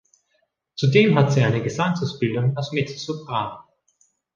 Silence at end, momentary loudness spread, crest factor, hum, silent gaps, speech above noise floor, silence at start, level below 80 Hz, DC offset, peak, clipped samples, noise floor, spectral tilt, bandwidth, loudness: 0.75 s; 11 LU; 20 dB; none; none; 50 dB; 0.75 s; -58 dBFS; under 0.1%; -2 dBFS; under 0.1%; -70 dBFS; -6.5 dB/octave; 7.4 kHz; -21 LUFS